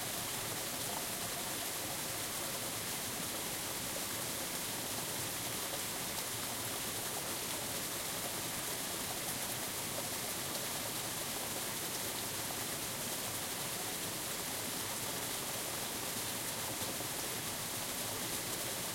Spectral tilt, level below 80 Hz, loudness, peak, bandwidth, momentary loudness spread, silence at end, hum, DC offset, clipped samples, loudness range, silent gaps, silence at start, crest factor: -1.5 dB/octave; -64 dBFS; -37 LUFS; -24 dBFS; 16.5 kHz; 1 LU; 0 s; none; under 0.1%; under 0.1%; 0 LU; none; 0 s; 16 dB